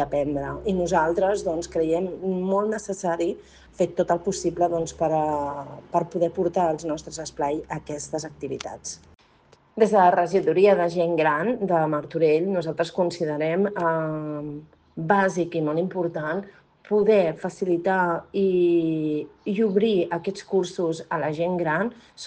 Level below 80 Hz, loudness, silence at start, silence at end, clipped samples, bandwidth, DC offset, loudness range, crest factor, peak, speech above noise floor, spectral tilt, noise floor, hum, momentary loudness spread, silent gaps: -54 dBFS; -24 LUFS; 0 s; 0 s; under 0.1%; 9.6 kHz; under 0.1%; 5 LU; 20 dB; -4 dBFS; 34 dB; -6 dB/octave; -57 dBFS; none; 12 LU; none